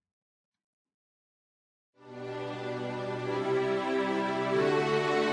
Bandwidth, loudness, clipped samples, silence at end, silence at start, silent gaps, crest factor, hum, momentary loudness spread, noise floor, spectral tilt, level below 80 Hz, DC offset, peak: 10.5 kHz; -30 LUFS; under 0.1%; 0 s; 2.05 s; none; 16 dB; none; 11 LU; under -90 dBFS; -6 dB/octave; -72 dBFS; under 0.1%; -16 dBFS